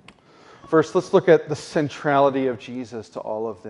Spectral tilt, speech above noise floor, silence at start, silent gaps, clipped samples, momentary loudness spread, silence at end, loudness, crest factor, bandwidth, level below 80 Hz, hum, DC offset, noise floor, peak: -6.5 dB/octave; 29 dB; 0.7 s; none; under 0.1%; 15 LU; 0 s; -21 LUFS; 20 dB; 11 kHz; -66 dBFS; none; under 0.1%; -50 dBFS; -2 dBFS